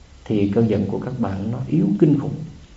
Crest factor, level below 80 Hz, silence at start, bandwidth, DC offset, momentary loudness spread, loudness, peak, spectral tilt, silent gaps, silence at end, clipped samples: 18 dB; -48 dBFS; 0.25 s; 7.8 kHz; under 0.1%; 9 LU; -21 LUFS; -4 dBFS; -9.5 dB/octave; none; 0 s; under 0.1%